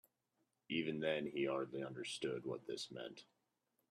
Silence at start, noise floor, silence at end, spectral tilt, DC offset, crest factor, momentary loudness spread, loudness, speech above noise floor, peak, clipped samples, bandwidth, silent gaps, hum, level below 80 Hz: 0.7 s; -85 dBFS; 0.7 s; -4.5 dB/octave; under 0.1%; 20 dB; 9 LU; -43 LUFS; 42 dB; -24 dBFS; under 0.1%; 13.5 kHz; none; none; -84 dBFS